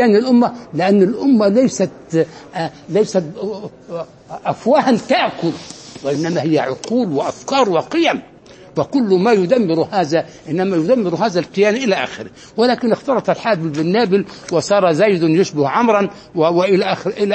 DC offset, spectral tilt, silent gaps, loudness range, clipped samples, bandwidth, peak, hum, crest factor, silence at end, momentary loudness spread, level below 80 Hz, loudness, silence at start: under 0.1%; -6 dB/octave; none; 3 LU; under 0.1%; 8.8 kHz; 0 dBFS; none; 16 dB; 0 s; 12 LU; -58 dBFS; -16 LUFS; 0 s